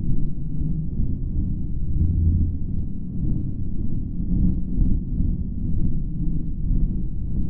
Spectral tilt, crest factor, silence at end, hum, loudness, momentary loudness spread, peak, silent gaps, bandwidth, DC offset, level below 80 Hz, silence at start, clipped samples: -14.5 dB/octave; 12 dB; 0 s; none; -26 LUFS; 7 LU; -8 dBFS; none; 1 kHz; under 0.1%; -24 dBFS; 0 s; under 0.1%